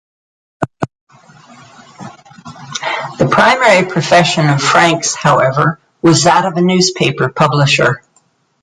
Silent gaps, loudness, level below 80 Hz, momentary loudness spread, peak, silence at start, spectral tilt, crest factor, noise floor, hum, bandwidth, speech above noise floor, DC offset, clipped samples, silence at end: 1.01-1.07 s; -11 LUFS; -48 dBFS; 12 LU; 0 dBFS; 0.6 s; -4.5 dB/octave; 14 dB; -56 dBFS; none; 11.5 kHz; 46 dB; under 0.1%; under 0.1%; 0.65 s